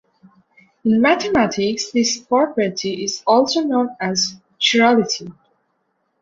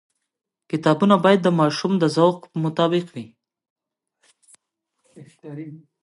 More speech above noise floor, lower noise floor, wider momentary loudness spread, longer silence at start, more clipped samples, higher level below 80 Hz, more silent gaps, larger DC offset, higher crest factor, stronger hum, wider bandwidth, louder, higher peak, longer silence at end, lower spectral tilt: second, 51 dB vs 56 dB; second, -69 dBFS vs -76 dBFS; second, 8 LU vs 21 LU; first, 0.85 s vs 0.7 s; neither; first, -56 dBFS vs -72 dBFS; second, none vs 3.70-3.76 s; neither; about the same, 16 dB vs 20 dB; neither; second, 7.8 kHz vs 11.5 kHz; about the same, -18 LUFS vs -19 LUFS; about the same, -2 dBFS vs -2 dBFS; first, 0.9 s vs 0.25 s; second, -3.5 dB/octave vs -6.5 dB/octave